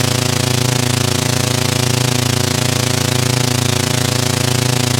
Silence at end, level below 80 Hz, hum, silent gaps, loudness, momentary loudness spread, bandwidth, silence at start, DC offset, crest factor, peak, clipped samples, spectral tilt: 0 s; -56 dBFS; none; none; -15 LUFS; 0 LU; 19 kHz; 0 s; under 0.1%; 14 dB; 0 dBFS; under 0.1%; -4 dB/octave